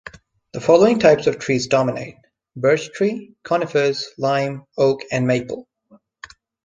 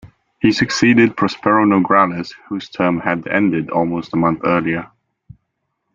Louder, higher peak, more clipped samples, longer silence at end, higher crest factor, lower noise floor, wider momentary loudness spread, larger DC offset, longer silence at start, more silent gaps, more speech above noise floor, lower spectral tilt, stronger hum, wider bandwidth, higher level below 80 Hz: second, -19 LUFS vs -16 LUFS; about the same, -2 dBFS vs -2 dBFS; neither; about the same, 1.05 s vs 1.1 s; about the same, 18 dB vs 16 dB; second, -54 dBFS vs -73 dBFS; first, 17 LU vs 10 LU; neither; about the same, 0.05 s vs 0.05 s; neither; second, 36 dB vs 57 dB; about the same, -5.5 dB/octave vs -6 dB/octave; neither; first, 9.6 kHz vs 7.4 kHz; about the same, -58 dBFS vs -54 dBFS